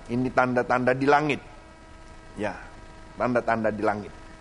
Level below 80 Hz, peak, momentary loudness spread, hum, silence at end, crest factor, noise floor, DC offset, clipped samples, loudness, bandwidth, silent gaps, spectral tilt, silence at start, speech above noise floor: -50 dBFS; -4 dBFS; 21 LU; none; 0.05 s; 22 dB; -46 dBFS; under 0.1%; under 0.1%; -25 LUFS; 10.5 kHz; none; -6.5 dB/octave; 0 s; 22 dB